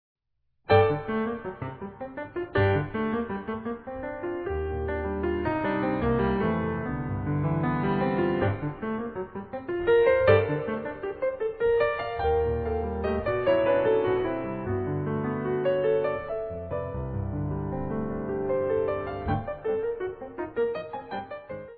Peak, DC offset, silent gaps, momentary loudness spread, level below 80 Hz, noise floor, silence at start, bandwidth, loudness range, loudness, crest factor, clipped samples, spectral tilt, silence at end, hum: -8 dBFS; under 0.1%; none; 12 LU; -44 dBFS; -72 dBFS; 0.7 s; 4.8 kHz; 5 LU; -28 LUFS; 20 dB; under 0.1%; -11 dB/octave; 0 s; none